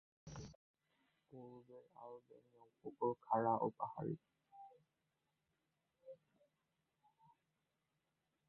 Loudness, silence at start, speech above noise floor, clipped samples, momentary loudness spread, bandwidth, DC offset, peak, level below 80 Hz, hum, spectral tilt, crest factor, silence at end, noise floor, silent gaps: -42 LUFS; 0.25 s; 44 dB; under 0.1%; 24 LU; 4.2 kHz; under 0.1%; -24 dBFS; -78 dBFS; none; -7.5 dB/octave; 26 dB; 2.35 s; -88 dBFS; 0.55-0.74 s